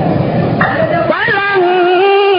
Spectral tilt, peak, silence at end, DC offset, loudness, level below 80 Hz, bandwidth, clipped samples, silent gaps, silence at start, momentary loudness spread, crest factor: -10.5 dB/octave; 0 dBFS; 0 s; under 0.1%; -11 LUFS; -40 dBFS; 5.4 kHz; under 0.1%; none; 0 s; 4 LU; 10 dB